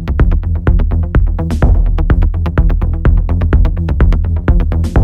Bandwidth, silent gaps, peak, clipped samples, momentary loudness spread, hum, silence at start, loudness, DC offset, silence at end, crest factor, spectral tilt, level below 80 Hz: 4.3 kHz; none; 0 dBFS; under 0.1%; 2 LU; none; 0 s; -14 LUFS; under 0.1%; 0 s; 10 dB; -9 dB/octave; -12 dBFS